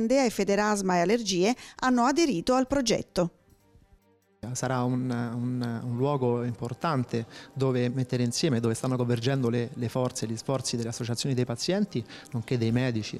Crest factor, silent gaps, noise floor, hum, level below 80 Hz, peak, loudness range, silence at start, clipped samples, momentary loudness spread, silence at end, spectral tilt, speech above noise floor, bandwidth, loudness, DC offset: 14 dB; none; -62 dBFS; none; -58 dBFS; -14 dBFS; 5 LU; 0 s; under 0.1%; 7 LU; 0 s; -5.5 dB/octave; 35 dB; 14.5 kHz; -28 LUFS; under 0.1%